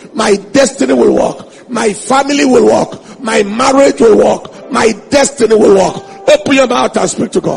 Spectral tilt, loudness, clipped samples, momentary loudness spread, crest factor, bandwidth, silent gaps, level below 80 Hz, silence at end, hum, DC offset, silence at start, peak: -4 dB/octave; -10 LUFS; 0.4%; 9 LU; 10 dB; 11 kHz; none; -42 dBFS; 0 s; none; under 0.1%; 0.05 s; 0 dBFS